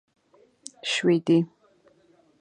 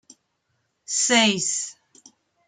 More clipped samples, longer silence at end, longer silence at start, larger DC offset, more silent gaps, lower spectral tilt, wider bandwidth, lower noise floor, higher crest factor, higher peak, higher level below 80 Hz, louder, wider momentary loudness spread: neither; first, 0.95 s vs 0.75 s; about the same, 0.85 s vs 0.9 s; neither; neither; first, -5 dB/octave vs -1.5 dB/octave; about the same, 10 kHz vs 10.5 kHz; second, -61 dBFS vs -73 dBFS; about the same, 18 dB vs 20 dB; second, -10 dBFS vs -6 dBFS; second, -78 dBFS vs -72 dBFS; second, -24 LUFS vs -20 LUFS; first, 22 LU vs 11 LU